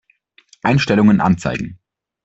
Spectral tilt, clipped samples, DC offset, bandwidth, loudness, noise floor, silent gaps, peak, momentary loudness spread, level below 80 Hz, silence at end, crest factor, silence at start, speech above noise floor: -7 dB/octave; under 0.1%; under 0.1%; 8 kHz; -16 LUFS; -55 dBFS; none; -2 dBFS; 12 LU; -46 dBFS; 0.5 s; 14 dB; 0.65 s; 41 dB